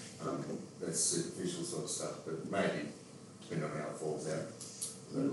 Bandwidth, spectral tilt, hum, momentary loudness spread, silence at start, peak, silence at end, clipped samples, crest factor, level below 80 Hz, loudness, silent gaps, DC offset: 12 kHz; -4 dB/octave; none; 11 LU; 0 s; -22 dBFS; 0 s; under 0.1%; 18 dB; -78 dBFS; -38 LUFS; none; under 0.1%